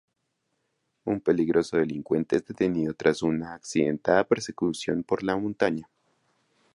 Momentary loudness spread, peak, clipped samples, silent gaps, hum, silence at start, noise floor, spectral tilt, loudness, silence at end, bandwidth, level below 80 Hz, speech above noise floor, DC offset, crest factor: 7 LU; -6 dBFS; under 0.1%; none; none; 1.05 s; -77 dBFS; -6 dB/octave; -26 LUFS; 0.95 s; 11.5 kHz; -60 dBFS; 51 dB; under 0.1%; 20 dB